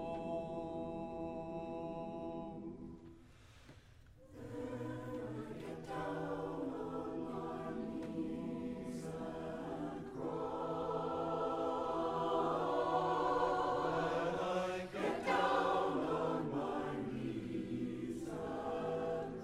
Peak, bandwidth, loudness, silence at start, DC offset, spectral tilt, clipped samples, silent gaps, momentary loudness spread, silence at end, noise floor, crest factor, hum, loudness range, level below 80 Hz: -22 dBFS; 13.5 kHz; -40 LUFS; 0 s; under 0.1%; -6.5 dB/octave; under 0.1%; none; 10 LU; 0 s; -61 dBFS; 18 dB; none; 12 LU; -64 dBFS